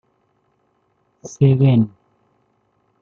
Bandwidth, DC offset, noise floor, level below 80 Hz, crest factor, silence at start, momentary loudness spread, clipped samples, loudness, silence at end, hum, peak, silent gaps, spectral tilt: 7.2 kHz; under 0.1%; -65 dBFS; -60 dBFS; 18 dB; 1.25 s; 25 LU; under 0.1%; -16 LUFS; 1.15 s; none; -4 dBFS; none; -8.5 dB/octave